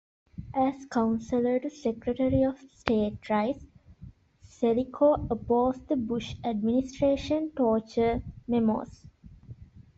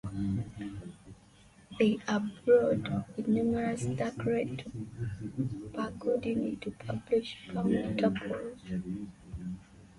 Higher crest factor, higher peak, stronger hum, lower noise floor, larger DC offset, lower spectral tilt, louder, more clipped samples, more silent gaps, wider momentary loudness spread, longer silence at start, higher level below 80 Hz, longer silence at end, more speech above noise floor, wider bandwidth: first, 24 dB vs 18 dB; first, -4 dBFS vs -14 dBFS; neither; about the same, -57 dBFS vs -59 dBFS; neither; about the same, -7 dB/octave vs -7 dB/octave; first, -28 LUFS vs -33 LUFS; neither; neither; second, 7 LU vs 14 LU; first, 0.4 s vs 0.05 s; first, -50 dBFS vs -56 dBFS; about the same, 0.15 s vs 0.1 s; about the same, 29 dB vs 28 dB; second, 7.8 kHz vs 11.5 kHz